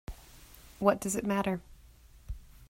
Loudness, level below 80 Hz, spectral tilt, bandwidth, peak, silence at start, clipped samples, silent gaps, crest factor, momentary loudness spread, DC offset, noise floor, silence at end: -31 LUFS; -50 dBFS; -5 dB/octave; 16 kHz; -8 dBFS; 0.1 s; under 0.1%; none; 26 dB; 25 LU; under 0.1%; -56 dBFS; 0.05 s